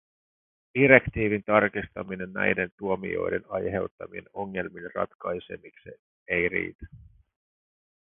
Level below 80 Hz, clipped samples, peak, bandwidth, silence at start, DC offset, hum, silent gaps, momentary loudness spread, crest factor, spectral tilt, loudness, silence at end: -54 dBFS; under 0.1%; -2 dBFS; 3.8 kHz; 0.75 s; under 0.1%; none; 2.72-2.78 s, 3.91-3.98 s, 5.15-5.19 s, 5.99-6.26 s, 6.75-6.79 s; 17 LU; 28 dB; -10.5 dB/octave; -26 LUFS; 1.05 s